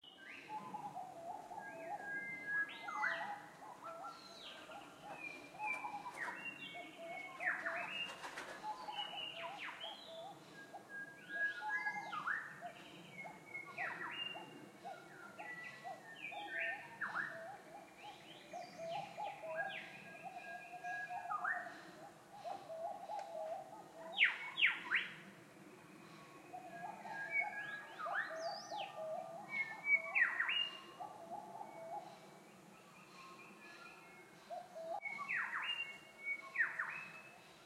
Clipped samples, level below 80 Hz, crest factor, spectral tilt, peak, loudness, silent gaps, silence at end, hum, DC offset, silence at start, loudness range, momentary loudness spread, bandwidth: under 0.1%; -90 dBFS; 26 dB; -2.5 dB/octave; -18 dBFS; -43 LUFS; none; 0 s; none; under 0.1%; 0.05 s; 9 LU; 17 LU; 16 kHz